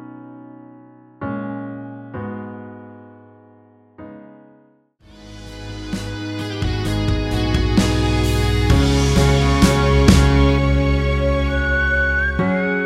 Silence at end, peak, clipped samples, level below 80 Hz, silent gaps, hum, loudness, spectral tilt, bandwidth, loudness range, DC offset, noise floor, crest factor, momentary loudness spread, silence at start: 0 s; 0 dBFS; under 0.1%; -24 dBFS; none; none; -18 LUFS; -6 dB/octave; 14.5 kHz; 20 LU; under 0.1%; -54 dBFS; 18 dB; 22 LU; 0 s